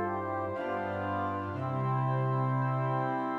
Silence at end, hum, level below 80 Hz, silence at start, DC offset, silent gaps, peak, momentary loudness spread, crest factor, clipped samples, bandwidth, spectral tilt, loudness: 0 s; none; -70 dBFS; 0 s; under 0.1%; none; -20 dBFS; 4 LU; 12 dB; under 0.1%; 4.4 kHz; -9.5 dB/octave; -32 LUFS